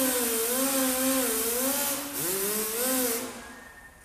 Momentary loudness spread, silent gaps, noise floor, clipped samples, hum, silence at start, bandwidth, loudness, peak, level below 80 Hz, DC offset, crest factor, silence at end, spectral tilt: 11 LU; none; -48 dBFS; under 0.1%; none; 0 s; 15.5 kHz; -26 LUFS; -14 dBFS; -60 dBFS; under 0.1%; 14 dB; 0 s; -1.5 dB/octave